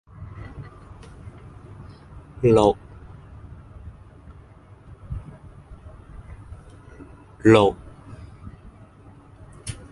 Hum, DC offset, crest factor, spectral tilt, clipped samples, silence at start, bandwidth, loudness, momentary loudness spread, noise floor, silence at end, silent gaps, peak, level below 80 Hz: none; under 0.1%; 26 dB; -7 dB/octave; under 0.1%; 0.2 s; 11.5 kHz; -19 LUFS; 28 LU; -48 dBFS; 0.2 s; none; -2 dBFS; -44 dBFS